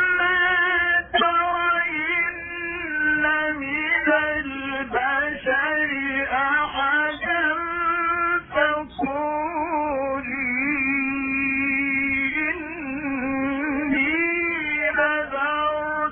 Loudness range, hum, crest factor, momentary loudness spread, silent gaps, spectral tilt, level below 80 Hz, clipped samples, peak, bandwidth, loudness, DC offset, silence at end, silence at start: 2 LU; none; 16 dB; 7 LU; none; -8.5 dB/octave; -50 dBFS; under 0.1%; -6 dBFS; 4 kHz; -22 LUFS; under 0.1%; 0 s; 0 s